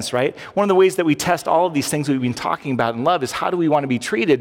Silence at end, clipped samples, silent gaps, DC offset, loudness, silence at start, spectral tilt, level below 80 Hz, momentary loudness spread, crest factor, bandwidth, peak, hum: 0 s; under 0.1%; none; under 0.1%; -19 LUFS; 0 s; -5 dB/octave; -58 dBFS; 7 LU; 14 dB; 17 kHz; -4 dBFS; none